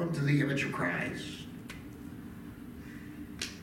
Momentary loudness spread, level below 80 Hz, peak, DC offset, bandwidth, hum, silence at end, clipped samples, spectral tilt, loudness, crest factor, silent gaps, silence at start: 17 LU; -58 dBFS; -16 dBFS; under 0.1%; 16.5 kHz; none; 0 s; under 0.1%; -5.5 dB/octave; -34 LUFS; 20 dB; none; 0 s